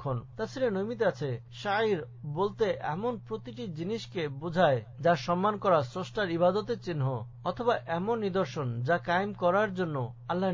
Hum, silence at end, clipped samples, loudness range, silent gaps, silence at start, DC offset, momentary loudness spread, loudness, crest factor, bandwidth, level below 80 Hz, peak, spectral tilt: none; 0 s; under 0.1%; 3 LU; none; 0 s; under 0.1%; 9 LU; -30 LUFS; 18 dB; 7.6 kHz; -60 dBFS; -12 dBFS; -7 dB/octave